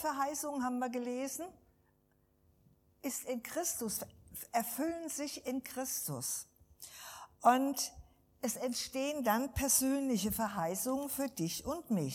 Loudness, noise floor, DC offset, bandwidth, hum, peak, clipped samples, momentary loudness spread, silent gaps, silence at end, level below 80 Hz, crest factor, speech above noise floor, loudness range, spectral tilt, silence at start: -36 LUFS; -73 dBFS; under 0.1%; 19 kHz; none; -14 dBFS; under 0.1%; 15 LU; none; 0 s; -62 dBFS; 22 dB; 37 dB; 7 LU; -3.5 dB/octave; 0 s